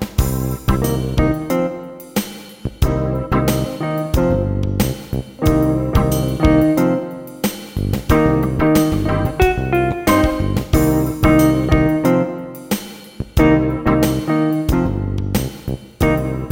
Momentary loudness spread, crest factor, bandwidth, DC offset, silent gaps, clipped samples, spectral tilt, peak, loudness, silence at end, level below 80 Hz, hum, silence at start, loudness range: 10 LU; 16 dB; 17.5 kHz; under 0.1%; none; under 0.1%; -6.5 dB/octave; -2 dBFS; -17 LUFS; 0 s; -26 dBFS; none; 0 s; 4 LU